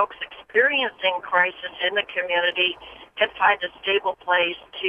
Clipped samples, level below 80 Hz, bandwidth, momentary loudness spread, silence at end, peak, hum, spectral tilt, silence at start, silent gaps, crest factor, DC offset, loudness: under 0.1%; -64 dBFS; 5.2 kHz; 6 LU; 0 s; -6 dBFS; none; -4.5 dB/octave; 0 s; none; 18 dB; under 0.1%; -22 LUFS